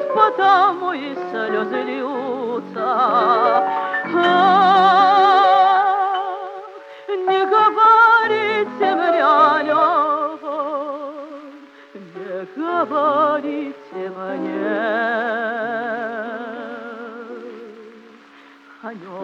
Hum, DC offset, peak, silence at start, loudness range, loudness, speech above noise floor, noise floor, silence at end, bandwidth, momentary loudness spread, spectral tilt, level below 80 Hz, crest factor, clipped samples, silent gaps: none; under 0.1%; -2 dBFS; 0 s; 10 LU; -17 LUFS; 29 dB; -46 dBFS; 0 s; 7.4 kHz; 21 LU; -5.5 dB/octave; -80 dBFS; 16 dB; under 0.1%; none